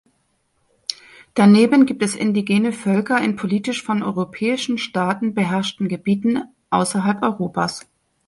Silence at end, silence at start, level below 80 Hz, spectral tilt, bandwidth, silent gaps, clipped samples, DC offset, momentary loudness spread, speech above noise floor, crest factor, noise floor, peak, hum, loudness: 0.45 s; 0.9 s; -60 dBFS; -5.5 dB/octave; 11.5 kHz; none; under 0.1%; under 0.1%; 11 LU; 48 dB; 18 dB; -66 dBFS; -2 dBFS; none; -19 LUFS